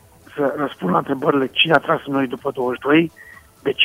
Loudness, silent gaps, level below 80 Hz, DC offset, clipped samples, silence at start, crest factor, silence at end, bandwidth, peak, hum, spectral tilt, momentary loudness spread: -19 LUFS; none; -58 dBFS; under 0.1%; under 0.1%; 0.35 s; 20 dB; 0 s; 16 kHz; 0 dBFS; none; -6 dB/octave; 10 LU